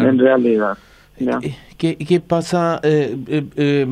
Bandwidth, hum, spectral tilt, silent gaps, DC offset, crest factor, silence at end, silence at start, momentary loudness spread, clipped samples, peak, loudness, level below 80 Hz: 11.5 kHz; none; -7 dB/octave; none; under 0.1%; 16 dB; 0 s; 0 s; 10 LU; under 0.1%; -2 dBFS; -18 LUFS; -52 dBFS